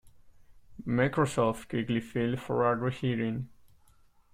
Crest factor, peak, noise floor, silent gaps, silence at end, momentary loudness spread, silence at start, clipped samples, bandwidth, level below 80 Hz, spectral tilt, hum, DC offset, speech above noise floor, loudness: 18 dB; -14 dBFS; -61 dBFS; none; 0.85 s; 7 LU; 0.05 s; under 0.1%; 15.5 kHz; -58 dBFS; -7 dB/octave; none; under 0.1%; 32 dB; -30 LUFS